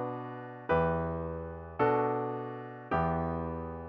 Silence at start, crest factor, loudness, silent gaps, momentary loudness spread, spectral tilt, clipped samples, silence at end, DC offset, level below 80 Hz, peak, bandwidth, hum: 0 s; 18 dB; -33 LUFS; none; 13 LU; -7 dB/octave; under 0.1%; 0 s; under 0.1%; -50 dBFS; -16 dBFS; 5.4 kHz; none